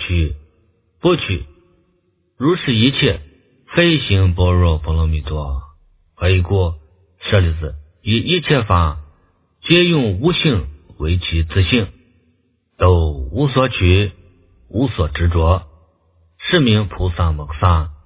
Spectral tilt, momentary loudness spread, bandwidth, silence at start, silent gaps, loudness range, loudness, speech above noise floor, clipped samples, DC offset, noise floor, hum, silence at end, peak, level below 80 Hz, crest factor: -11 dB/octave; 12 LU; 4 kHz; 0 s; none; 3 LU; -17 LUFS; 47 dB; under 0.1%; under 0.1%; -62 dBFS; none; 0.1 s; 0 dBFS; -24 dBFS; 16 dB